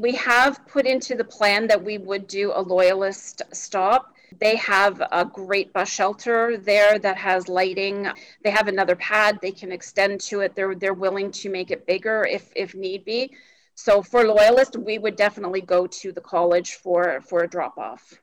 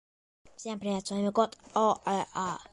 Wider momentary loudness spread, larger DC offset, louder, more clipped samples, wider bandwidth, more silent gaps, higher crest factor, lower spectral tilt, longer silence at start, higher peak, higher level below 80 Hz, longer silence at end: about the same, 11 LU vs 9 LU; neither; first, -21 LUFS vs -31 LUFS; neither; first, 17 kHz vs 11.5 kHz; neither; second, 12 dB vs 20 dB; second, -3 dB/octave vs -5 dB/octave; second, 0 s vs 0.6 s; about the same, -10 dBFS vs -12 dBFS; first, -62 dBFS vs -68 dBFS; first, 0.3 s vs 0.1 s